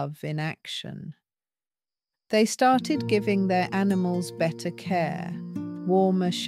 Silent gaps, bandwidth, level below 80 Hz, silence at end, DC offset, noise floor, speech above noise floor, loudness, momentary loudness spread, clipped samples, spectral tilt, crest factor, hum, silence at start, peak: none; 14.5 kHz; -70 dBFS; 0 s; under 0.1%; under -90 dBFS; over 65 dB; -26 LUFS; 12 LU; under 0.1%; -5.5 dB/octave; 18 dB; none; 0 s; -8 dBFS